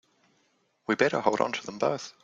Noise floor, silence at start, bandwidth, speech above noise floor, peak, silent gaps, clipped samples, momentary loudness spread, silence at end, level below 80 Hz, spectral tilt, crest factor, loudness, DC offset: -70 dBFS; 0.9 s; 7.8 kHz; 43 dB; -6 dBFS; none; under 0.1%; 7 LU; 0.15 s; -70 dBFS; -4.5 dB/octave; 24 dB; -27 LUFS; under 0.1%